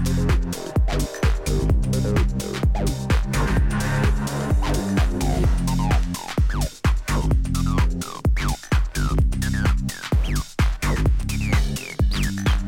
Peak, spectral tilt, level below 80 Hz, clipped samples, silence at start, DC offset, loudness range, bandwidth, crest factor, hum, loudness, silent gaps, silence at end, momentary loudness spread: -8 dBFS; -5.5 dB/octave; -22 dBFS; under 0.1%; 0 s; under 0.1%; 1 LU; 17 kHz; 14 dB; none; -23 LUFS; none; 0 s; 3 LU